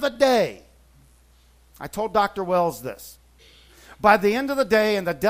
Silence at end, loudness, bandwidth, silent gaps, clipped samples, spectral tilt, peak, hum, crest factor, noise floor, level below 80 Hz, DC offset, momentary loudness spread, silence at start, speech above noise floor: 0 s; -21 LUFS; 16 kHz; none; under 0.1%; -4.5 dB/octave; -2 dBFS; none; 22 dB; -55 dBFS; -54 dBFS; under 0.1%; 17 LU; 0 s; 34 dB